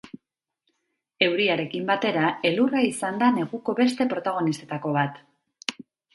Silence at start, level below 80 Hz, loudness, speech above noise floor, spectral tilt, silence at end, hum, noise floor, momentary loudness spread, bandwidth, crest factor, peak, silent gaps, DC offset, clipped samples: 0.05 s; -72 dBFS; -24 LUFS; 56 dB; -5 dB/octave; 0.45 s; none; -80 dBFS; 8 LU; 11.5 kHz; 22 dB; -4 dBFS; none; under 0.1%; under 0.1%